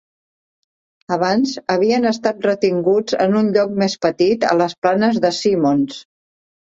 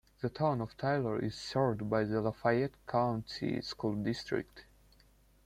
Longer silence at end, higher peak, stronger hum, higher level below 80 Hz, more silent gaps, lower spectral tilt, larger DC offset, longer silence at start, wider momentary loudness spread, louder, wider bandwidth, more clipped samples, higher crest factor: about the same, 0.75 s vs 0.85 s; first, -2 dBFS vs -16 dBFS; neither; about the same, -60 dBFS vs -62 dBFS; first, 4.78-4.82 s vs none; second, -5.5 dB/octave vs -7 dB/octave; neither; first, 1.1 s vs 0.2 s; about the same, 3 LU vs 5 LU; first, -17 LUFS vs -34 LUFS; second, 7.8 kHz vs 14 kHz; neither; about the same, 16 dB vs 18 dB